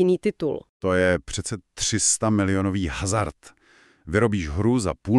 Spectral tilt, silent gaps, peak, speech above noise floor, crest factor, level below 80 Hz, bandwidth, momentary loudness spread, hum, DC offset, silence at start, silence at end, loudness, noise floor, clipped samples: -4.5 dB/octave; 0.69-0.80 s; -6 dBFS; 34 dB; 16 dB; -42 dBFS; 12.5 kHz; 9 LU; none; under 0.1%; 0 s; 0 s; -23 LUFS; -56 dBFS; under 0.1%